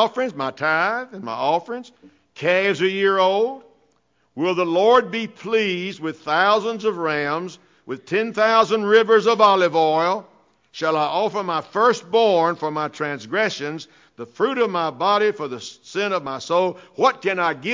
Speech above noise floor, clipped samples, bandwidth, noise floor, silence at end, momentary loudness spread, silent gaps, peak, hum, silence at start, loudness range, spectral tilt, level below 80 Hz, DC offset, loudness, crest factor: 45 dB; under 0.1%; 7.6 kHz; -65 dBFS; 0 s; 13 LU; none; -4 dBFS; none; 0 s; 5 LU; -4.5 dB/octave; -68 dBFS; under 0.1%; -20 LUFS; 18 dB